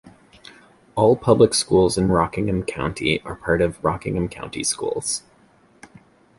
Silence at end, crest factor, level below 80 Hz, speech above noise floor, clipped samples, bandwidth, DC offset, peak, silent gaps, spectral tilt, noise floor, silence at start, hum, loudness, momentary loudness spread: 1.2 s; 18 dB; -42 dBFS; 35 dB; under 0.1%; 11.5 kHz; under 0.1%; -2 dBFS; none; -4.5 dB/octave; -55 dBFS; 0.05 s; none; -21 LUFS; 10 LU